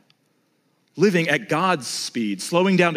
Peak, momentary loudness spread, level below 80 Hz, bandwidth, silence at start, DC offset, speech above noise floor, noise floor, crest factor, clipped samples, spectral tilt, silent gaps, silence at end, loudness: -4 dBFS; 8 LU; -74 dBFS; 15.5 kHz; 0.95 s; under 0.1%; 46 dB; -66 dBFS; 18 dB; under 0.1%; -5 dB/octave; none; 0 s; -21 LUFS